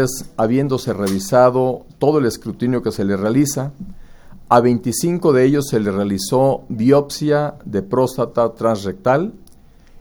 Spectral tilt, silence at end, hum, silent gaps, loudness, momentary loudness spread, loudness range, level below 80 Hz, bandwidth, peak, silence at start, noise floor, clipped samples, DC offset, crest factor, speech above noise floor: -6 dB/octave; 0 s; none; none; -17 LUFS; 8 LU; 2 LU; -46 dBFS; over 20 kHz; 0 dBFS; 0 s; -45 dBFS; under 0.1%; under 0.1%; 18 dB; 28 dB